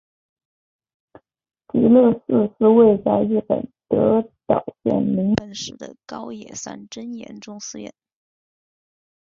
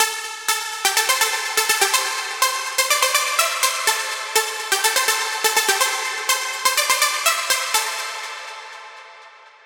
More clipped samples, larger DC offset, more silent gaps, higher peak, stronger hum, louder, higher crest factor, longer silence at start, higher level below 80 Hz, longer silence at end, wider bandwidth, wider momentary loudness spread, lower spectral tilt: neither; neither; neither; about the same, -2 dBFS vs 0 dBFS; neither; about the same, -18 LUFS vs -18 LUFS; about the same, 20 dB vs 20 dB; first, 1.75 s vs 0 s; first, -56 dBFS vs -74 dBFS; first, 1.35 s vs 0.15 s; second, 7.6 kHz vs 19.5 kHz; first, 20 LU vs 10 LU; first, -6.5 dB/octave vs 3 dB/octave